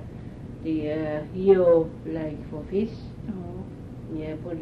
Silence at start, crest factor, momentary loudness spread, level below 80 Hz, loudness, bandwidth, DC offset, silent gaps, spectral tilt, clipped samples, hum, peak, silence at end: 0 s; 20 dB; 20 LU; -46 dBFS; -26 LUFS; 5.8 kHz; under 0.1%; none; -9.5 dB/octave; under 0.1%; none; -6 dBFS; 0 s